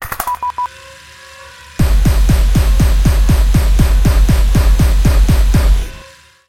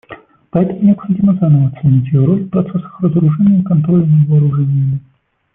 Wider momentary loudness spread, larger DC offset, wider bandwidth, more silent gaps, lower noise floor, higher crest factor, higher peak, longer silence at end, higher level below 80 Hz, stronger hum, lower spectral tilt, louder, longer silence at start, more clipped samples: first, 11 LU vs 7 LU; first, 0.2% vs under 0.1%; first, 16.5 kHz vs 3.4 kHz; neither; about the same, -40 dBFS vs -37 dBFS; about the same, 10 dB vs 10 dB; about the same, 0 dBFS vs -2 dBFS; about the same, 0.45 s vs 0.55 s; first, -12 dBFS vs -48 dBFS; neither; second, -6 dB/octave vs -14.5 dB/octave; about the same, -13 LUFS vs -13 LUFS; about the same, 0 s vs 0.1 s; neither